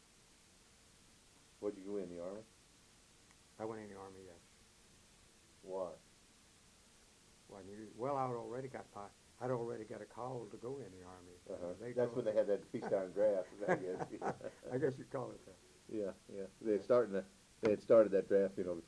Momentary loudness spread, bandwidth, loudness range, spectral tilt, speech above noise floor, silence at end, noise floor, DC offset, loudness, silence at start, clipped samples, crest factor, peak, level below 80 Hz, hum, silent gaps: 21 LU; 11 kHz; 16 LU; -6.5 dB/octave; 28 dB; 0 s; -66 dBFS; under 0.1%; -39 LUFS; 1.6 s; under 0.1%; 22 dB; -18 dBFS; -74 dBFS; none; none